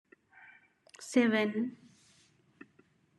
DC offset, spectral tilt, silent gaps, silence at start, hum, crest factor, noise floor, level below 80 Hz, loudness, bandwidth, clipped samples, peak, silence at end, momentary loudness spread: under 0.1%; -5 dB/octave; none; 1 s; none; 22 dB; -68 dBFS; -90 dBFS; -31 LUFS; 12 kHz; under 0.1%; -14 dBFS; 1.5 s; 13 LU